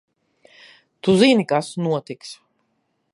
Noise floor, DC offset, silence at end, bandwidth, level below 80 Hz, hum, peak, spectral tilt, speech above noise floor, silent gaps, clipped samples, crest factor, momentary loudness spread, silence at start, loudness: -70 dBFS; under 0.1%; 0.8 s; 11.5 kHz; -64 dBFS; none; -2 dBFS; -5.5 dB/octave; 52 dB; none; under 0.1%; 20 dB; 20 LU; 1.05 s; -19 LUFS